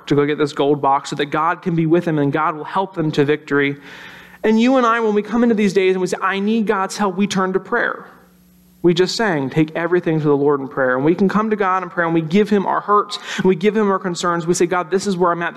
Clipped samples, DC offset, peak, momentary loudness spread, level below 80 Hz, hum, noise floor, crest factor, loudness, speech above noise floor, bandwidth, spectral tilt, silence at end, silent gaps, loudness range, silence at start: under 0.1%; under 0.1%; -4 dBFS; 5 LU; -56 dBFS; none; -50 dBFS; 12 dB; -17 LUFS; 33 dB; 12.5 kHz; -6 dB/octave; 0 s; none; 2 LU; 0.05 s